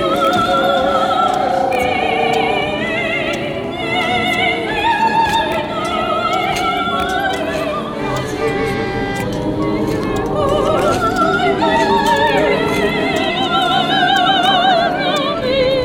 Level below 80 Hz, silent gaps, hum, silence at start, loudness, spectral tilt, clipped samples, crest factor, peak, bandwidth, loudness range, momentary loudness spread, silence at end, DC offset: -38 dBFS; none; none; 0 s; -15 LUFS; -4.5 dB/octave; under 0.1%; 14 dB; -2 dBFS; over 20 kHz; 4 LU; 6 LU; 0 s; under 0.1%